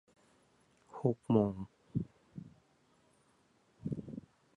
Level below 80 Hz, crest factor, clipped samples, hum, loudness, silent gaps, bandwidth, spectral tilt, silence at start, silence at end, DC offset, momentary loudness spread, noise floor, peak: -66 dBFS; 24 dB; under 0.1%; none; -37 LUFS; none; 10.5 kHz; -10 dB/octave; 0.95 s; 0.35 s; under 0.1%; 22 LU; -71 dBFS; -16 dBFS